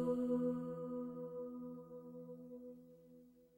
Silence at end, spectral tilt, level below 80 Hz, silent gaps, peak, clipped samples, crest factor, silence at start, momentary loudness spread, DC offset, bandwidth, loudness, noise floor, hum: 0.1 s; -9.5 dB/octave; -76 dBFS; none; -28 dBFS; under 0.1%; 16 dB; 0 s; 24 LU; under 0.1%; 16.5 kHz; -44 LUFS; -64 dBFS; 60 Hz at -80 dBFS